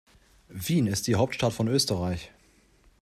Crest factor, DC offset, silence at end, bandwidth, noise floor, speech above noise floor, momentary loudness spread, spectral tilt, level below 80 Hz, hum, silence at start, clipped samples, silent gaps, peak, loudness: 18 dB; under 0.1%; 0.75 s; 15 kHz; -61 dBFS; 35 dB; 12 LU; -5 dB/octave; -56 dBFS; none; 0.5 s; under 0.1%; none; -10 dBFS; -27 LUFS